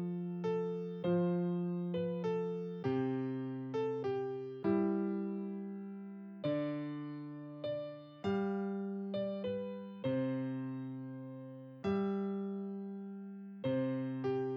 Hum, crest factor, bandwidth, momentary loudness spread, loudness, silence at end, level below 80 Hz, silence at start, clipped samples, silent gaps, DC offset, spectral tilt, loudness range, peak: none; 16 dB; 6.6 kHz; 11 LU; -38 LUFS; 0 s; -78 dBFS; 0 s; under 0.1%; none; under 0.1%; -9.5 dB/octave; 4 LU; -22 dBFS